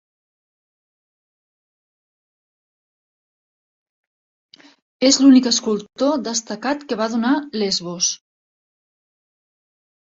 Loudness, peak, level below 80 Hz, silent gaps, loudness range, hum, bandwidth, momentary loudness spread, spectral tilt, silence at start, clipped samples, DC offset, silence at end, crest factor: -18 LUFS; -2 dBFS; -66 dBFS; none; 6 LU; none; 7.8 kHz; 12 LU; -2.5 dB/octave; 5 s; under 0.1%; under 0.1%; 1.95 s; 20 dB